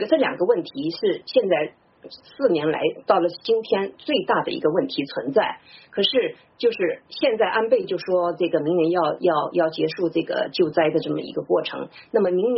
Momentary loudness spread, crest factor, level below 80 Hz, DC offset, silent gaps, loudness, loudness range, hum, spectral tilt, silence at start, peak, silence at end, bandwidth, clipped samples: 6 LU; 18 dB; -68 dBFS; under 0.1%; none; -22 LUFS; 1 LU; none; -3 dB/octave; 0 s; -4 dBFS; 0 s; 6 kHz; under 0.1%